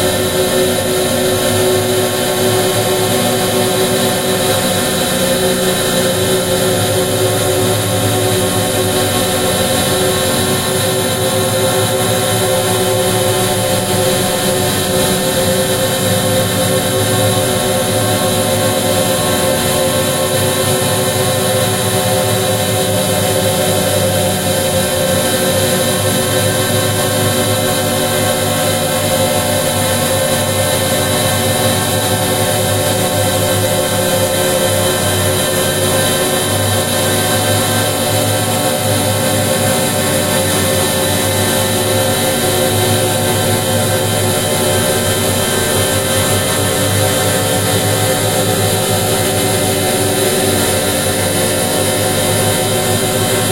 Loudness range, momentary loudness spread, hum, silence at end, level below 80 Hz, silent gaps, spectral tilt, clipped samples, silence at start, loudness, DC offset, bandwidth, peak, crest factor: 0 LU; 1 LU; none; 0 s; -40 dBFS; none; -3.5 dB/octave; under 0.1%; 0 s; -13 LUFS; 0.3%; 16 kHz; 0 dBFS; 14 dB